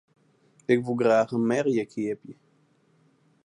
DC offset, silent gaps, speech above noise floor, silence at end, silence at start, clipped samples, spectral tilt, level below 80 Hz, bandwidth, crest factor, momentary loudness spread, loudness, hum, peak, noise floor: under 0.1%; none; 40 dB; 1.1 s; 0.7 s; under 0.1%; -6.5 dB/octave; -74 dBFS; 10.5 kHz; 18 dB; 12 LU; -25 LUFS; none; -8 dBFS; -64 dBFS